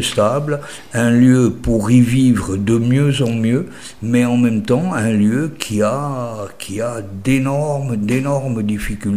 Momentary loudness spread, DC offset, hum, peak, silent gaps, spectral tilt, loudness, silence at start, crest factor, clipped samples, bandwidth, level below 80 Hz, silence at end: 11 LU; 1%; none; 0 dBFS; none; -6.5 dB/octave; -16 LUFS; 0 s; 16 dB; under 0.1%; 15.5 kHz; -38 dBFS; 0 s